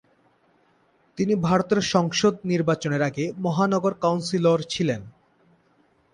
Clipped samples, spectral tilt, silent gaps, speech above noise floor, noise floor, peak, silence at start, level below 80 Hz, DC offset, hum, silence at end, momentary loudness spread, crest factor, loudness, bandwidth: under 0.1%; -5.5 dB/octave; none; 40 dB; -63 dBFS; -6 dBFS; 1.15 s; -58 dBFS; under 0.1%; none; 1.05 s; 6 LU; 20 dB; -23 LUFS; 10.5 kHz